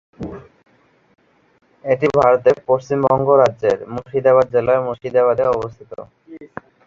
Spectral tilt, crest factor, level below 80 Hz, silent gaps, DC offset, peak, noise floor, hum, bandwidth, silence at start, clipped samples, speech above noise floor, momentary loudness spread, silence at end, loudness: -7.5 dB/octave; 16 dB; -52 dBFS; none; under 0.1%; -2 dBFS; -37 dBFS; none; 7.4 kHz; 0.2 s; under 0.1%; 21 dB; 22 LU; 0.4 s; -16 LUFS